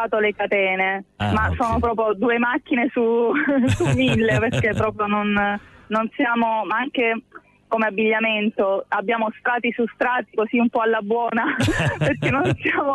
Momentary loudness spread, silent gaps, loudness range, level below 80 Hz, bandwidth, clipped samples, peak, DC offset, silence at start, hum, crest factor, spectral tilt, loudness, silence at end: 4 LU; none; 2 LU; -42 dBFS; 12 kHz; under 0.1%; -8 dBFS; under 0.1%; 0 s; none; 12 dB; -6.5 dB/octave; -21 LUFS; 0 s